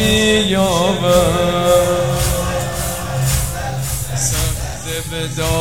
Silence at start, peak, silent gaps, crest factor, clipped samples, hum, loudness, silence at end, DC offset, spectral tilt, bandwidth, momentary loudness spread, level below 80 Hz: 0 s; 0 dBFS; none; 16 dB; under 0.1%; none; -16 LUFS; 0 s; 2%; -4 dB/octave; over 20 kHz; 9 LU; -28 dBFS